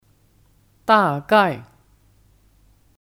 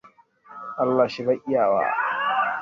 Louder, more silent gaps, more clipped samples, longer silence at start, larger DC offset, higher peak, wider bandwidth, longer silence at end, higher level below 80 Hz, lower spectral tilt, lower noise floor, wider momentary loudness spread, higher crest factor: first, -18 LUFS vs -23 LUFS; neither; neither; first, 0.9 s vs 0.05 s; neither; first, -2 dBFS vs -8 dBFS; first, 16.5 kHz vs 7.2 kHz; first, 1.4 s vs 0 s; first, -58 dBFS vs -68 dBFS; about the same, -6 dB/octave vs -6.5 dB/octave; first, -57 dBFS vs -51 dBFS; first, 14 LU vs 6 LU; about the same, 20 dB vs 16 dB